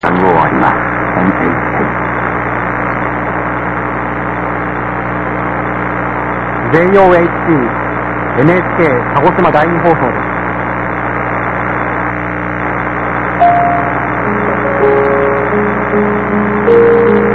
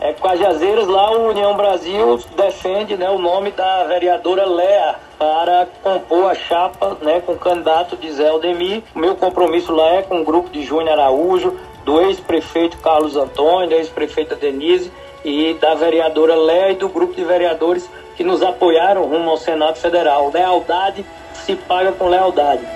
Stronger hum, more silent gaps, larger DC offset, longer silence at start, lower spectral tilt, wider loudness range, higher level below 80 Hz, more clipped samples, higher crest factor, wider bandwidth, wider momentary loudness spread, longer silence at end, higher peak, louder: first, 60 Hz at -25 dBFS vs none; neither; neither; about the same, 0.05 s vs 0 s; first, -9 dB/octave vs -5 dB/octave; first, 5 LU vs 1 LU; first, -32 dBFS vs -48 dBFS; first, 0.2% vs under 0.1%; about the same, 12 dB vs 14 dB; second, 6.4 kHz vs 12.5 kHz; about the same, 7 LU vs 7 LU; about the same, 0 s vs 0 s; about the same, 0 dBFS vs 0 dBFS; first, -12 LUFS vs -16 LUFS